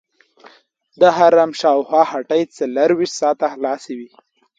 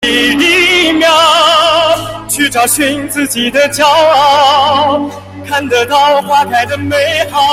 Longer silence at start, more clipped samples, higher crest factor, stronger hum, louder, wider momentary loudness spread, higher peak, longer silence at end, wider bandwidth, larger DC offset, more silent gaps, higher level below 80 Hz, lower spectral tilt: first, 1 s vs 0 s; neither; first, 16 dB vs 10 dB; neither; second, -16 LUFS vs -9 LUFS; first, 11 LU vs 8 LU; about the same, 0 dBFS vs 0 dBFS; first, 0.5 s vs 0 s; second, 9.2 kHz vs 16.5 kHz; neither; neither; second, -68 dBFS vs -44 dBFS; first, -4.5 dB/octave vs -2.5 dB/octave